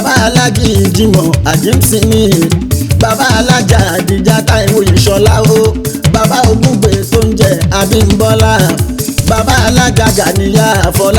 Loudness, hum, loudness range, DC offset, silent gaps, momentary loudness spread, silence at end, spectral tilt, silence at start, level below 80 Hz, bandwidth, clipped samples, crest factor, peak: -9 LUFS; none; 1 LU; under 0.1%; none; 4 LU; 0 s; -5 dB/octave; 0 s; -22 dBFS; over 20 kHz; 0.5%; 8 dB; 0 dBFS